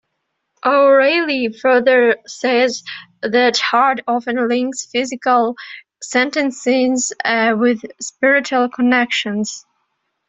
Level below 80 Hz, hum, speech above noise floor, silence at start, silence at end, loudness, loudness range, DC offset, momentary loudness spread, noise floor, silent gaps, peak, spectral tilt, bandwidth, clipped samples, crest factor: -64 dBFS; none; 57 dB; 0.65 s; 0.7 s; -16 LUFS; 3 LU; under 0.1%; 11 LU; -73 dBFS; none; -2 dBFS; -3 dB/octave; 8.2 kHz; under 0.1%; 14 dB